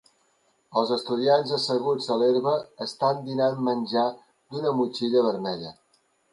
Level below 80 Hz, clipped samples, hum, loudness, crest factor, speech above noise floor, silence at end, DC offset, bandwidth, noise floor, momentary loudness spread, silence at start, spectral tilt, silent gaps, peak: -74 dBFS; under 0.1%; none; -25 LUFS; 16 dB; 43 dB; 0.6 s; under 0.1%; 11.5 kHz; -67 dBFS; 8 LU; 0.7 s; -6 dB/octave; none; -8 dBFS